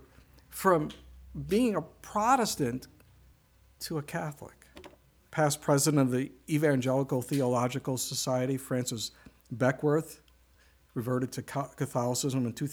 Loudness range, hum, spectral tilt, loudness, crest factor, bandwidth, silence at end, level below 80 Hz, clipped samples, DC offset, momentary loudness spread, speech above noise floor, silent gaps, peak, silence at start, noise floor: 5 LU; none; -5 dB/octave; -30 LUFS; 22 dB; over 20 kHz; 0 s; -60 dBFS; under 0.1%; under 0.1%; 15 LU; 33 dB; none; -10 dBFS; 0.5 s; -63 dBFS